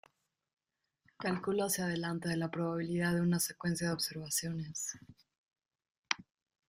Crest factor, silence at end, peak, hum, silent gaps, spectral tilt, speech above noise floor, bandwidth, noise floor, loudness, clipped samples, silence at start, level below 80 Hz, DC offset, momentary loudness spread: 28 dB; 0.45 s; -10 dBFS; none; 5.38-5.44 s, 5.91-6.03 s; -4 dB/octave; 44 dB; 15.5 kHz; -79 dBFS; -35 LUFS; under 0.1%; 1.2 s; -70 dBFS; under 0.1%; 8 LU